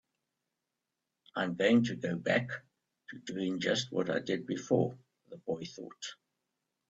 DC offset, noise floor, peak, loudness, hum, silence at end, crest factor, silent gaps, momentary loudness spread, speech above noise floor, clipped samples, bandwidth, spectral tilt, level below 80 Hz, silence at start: under 0.1%; -87 dBFS; -14 dBFS; -33 LUFS; none; 0.75 s; 20 dB; none; 17 LU; 55 dB; under 0.1%; 8 kHz; -5.5 dB/octave; -72 dBFS; 1.35 s